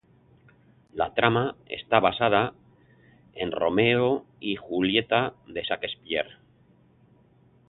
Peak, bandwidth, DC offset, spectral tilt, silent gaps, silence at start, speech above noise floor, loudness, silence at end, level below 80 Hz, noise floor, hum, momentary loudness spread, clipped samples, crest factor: -4 dBFS; 4.3 kHz; under 0.1%; -9.5 dB/octave; none; 0.95 s; 34 dB; -25 LUFS; 1.35 s; -58 dBFS; -60 dBFS; none; 12 LU; under 0.1%; 24 dB